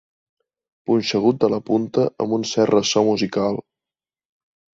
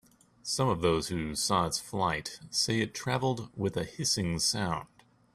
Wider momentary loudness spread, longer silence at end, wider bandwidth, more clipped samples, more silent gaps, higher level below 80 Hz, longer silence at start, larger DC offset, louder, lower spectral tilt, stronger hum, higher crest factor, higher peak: about the same, 6 LU vs 6 LU; first, 1.15 s vs 0.5 s; second, 7.8 kHz vs 15.5 kHz; neither; neither; about the same, -60 dBFS vs -56 dBFS; first, 0.9 s vs 0.45 s; neither; first, -20 LUFS vs -30 LUFS; first, -5 dB/octave vs -3.5 dB/octave; neither; about the same, 18 dB vs 18 dB; first, -4 dBFS vs -12 dBFS